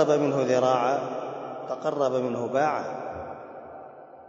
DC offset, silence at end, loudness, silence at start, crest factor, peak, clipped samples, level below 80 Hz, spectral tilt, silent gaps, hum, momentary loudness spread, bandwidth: under 0.1%; 0 s; -26 LUFS; 0 s; 18 dB; -8 dBFS; under 0.1%; -66 dBFS; -6 dB/octave; none; none; 20 LU; 7.8 kHz